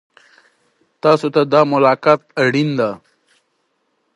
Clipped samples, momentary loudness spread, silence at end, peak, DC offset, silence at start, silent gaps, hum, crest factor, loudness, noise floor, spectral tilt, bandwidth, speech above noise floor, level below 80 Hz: under 0.1%; 7 LU; 1.2 s; 0 dBFS; under 0.1%; 1.05 s; none; none; 18 dB; -15 LUFS; -67 dBFS; -6.5 dB/octave; 11.5 kHz; 52 dB; -66 dBFS